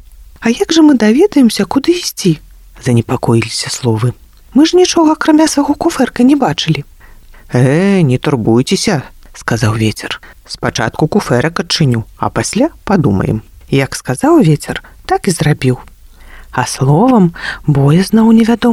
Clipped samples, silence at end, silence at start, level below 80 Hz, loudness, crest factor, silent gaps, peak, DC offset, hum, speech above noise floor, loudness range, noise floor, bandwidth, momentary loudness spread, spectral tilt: under 0.1%; 0 s; 0.4 s; -38 dBFS; -12 LUFS; 12 dB; none; 0 dBFS; under 0.1%; none; 26 dB; 3 LU; -37 dBFS; 15.5 kHz; 10 LU; -5.5 dB/octave